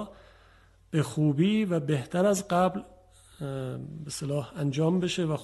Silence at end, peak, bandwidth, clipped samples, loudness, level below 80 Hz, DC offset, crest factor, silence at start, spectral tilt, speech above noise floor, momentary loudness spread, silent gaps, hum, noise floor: 0 s; -12 dBFS; 12.5 kHz; under 0.1%; -28 LUFS; -60 dBFS; under 0.1%; 16 dB; 0 s; -6 dB/octave; 31 dB; 12 LU; none; none; -58 dBFS